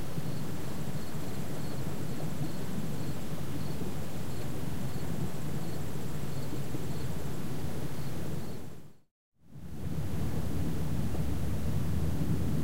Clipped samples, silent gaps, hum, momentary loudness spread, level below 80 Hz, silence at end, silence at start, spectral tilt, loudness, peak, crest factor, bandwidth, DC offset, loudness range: under 0.1%; 9.11-9.32 s; none; 7 LU; -46 dBFS; 0 s; 0 s; -6.5 dB/octave; -37 LUFS; -18 dBFS; 14 dB; 16 kHz; 4%; 4 LU